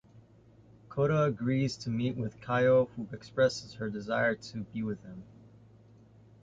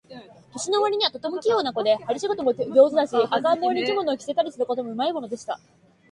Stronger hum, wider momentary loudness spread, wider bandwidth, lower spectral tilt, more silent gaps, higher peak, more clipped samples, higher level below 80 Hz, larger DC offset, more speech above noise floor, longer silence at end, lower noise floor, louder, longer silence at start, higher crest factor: neither; about the same, 14 LU vs 13 LU; second, 7.8 kHz vs 11 kHz; first, -6.5 dB/octave vs -3.5 dB/octave; neither; second, -14 dBFS vs -4 dBFS; neither; first, -62 dBFS vs -68 dBFS; neither; first, 28 dB vs 22 dB; first, 1.2 s vs 0.55 s; first, -59 dBFS vs -45 dBFS; second, -31 LUFS vs -23 LUFS; about the same, 0.15 s vs 0.1 s; about the same, 18 dB vs 18 dB